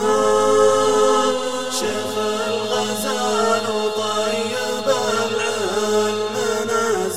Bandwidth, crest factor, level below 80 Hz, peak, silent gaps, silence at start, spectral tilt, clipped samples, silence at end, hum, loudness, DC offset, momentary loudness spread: 16 kHz; 16 dB; -64 dBFS; -4 dBFS; none; 0 s; -2.5 dB/octave; under 0.1%; 0 s; none; -19 LUFS; 0.8%; 6 LU